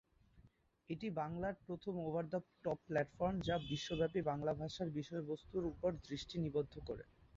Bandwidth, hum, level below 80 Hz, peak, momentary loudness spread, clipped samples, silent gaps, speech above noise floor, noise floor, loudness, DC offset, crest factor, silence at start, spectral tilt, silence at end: 7.6 kHz; none; -62 dBFS; -24 dBFS; 8 LU; under 0.1%; none; 28 dB; -70 dBFS; -42 LUFS; under 0.1%; 18 dB; 0.35 s; -5.5 dB/octave; 0.3 s